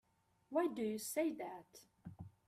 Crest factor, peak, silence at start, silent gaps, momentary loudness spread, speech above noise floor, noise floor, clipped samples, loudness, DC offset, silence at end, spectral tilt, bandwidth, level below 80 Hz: 18 dB; -24 dBFS; 0.5 s; none; 18 LU; 32 dB; -72 dBFS; under 0.1%; -41 LUFS; under 0.1%; 0.2 s; -4.5 dB/octave; 16 kHz; -78 dBFS